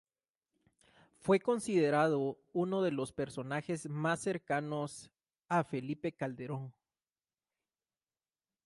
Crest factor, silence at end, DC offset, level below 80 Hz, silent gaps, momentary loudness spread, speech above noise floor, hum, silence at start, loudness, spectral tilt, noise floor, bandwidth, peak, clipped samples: 18 dB; 1.95 s; under 0.1%; -74 dBFS; none; 12 LU; over 56 dB; none; 1.25 s; -35 LUFS; -6 dB/octave; under -90 dBFS; 11.5 kHz; -18 dBFS; under 0.1%